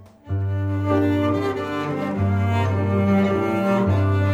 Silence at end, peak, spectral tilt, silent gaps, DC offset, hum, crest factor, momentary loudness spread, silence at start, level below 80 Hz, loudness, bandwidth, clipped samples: 0 s; -6 dBFS; -8.5 dB/octave; none; under 0.1%; none; 14 dB; 6 LU; 0 s; -52 dBFS; -21 LUFS; 7.4 kHz; under 0.1%